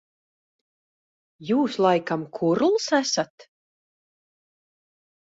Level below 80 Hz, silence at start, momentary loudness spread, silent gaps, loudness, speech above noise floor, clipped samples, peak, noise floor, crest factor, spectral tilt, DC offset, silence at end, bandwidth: -72 dBFS; 1.4 s; 9 LU; 3.30-3.38 s; -23 LUFS; over 67 dB; under 0.1%; -8 dBFS; under -90 dBFS; 20 dB; -4.5 dB/octave; under 0.1%; 1.9 s; 8 kHz